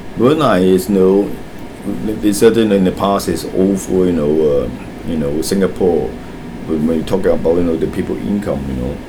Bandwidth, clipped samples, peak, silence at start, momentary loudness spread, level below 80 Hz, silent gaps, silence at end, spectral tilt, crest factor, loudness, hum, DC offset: over 20 kHz; under 0.1%; 0 dBFS; 0 s; 13 LU; -34 dBFS; none; 0 s; -6.5 dB/octave; 14 dB; -15 LUFS; none; under 0.1%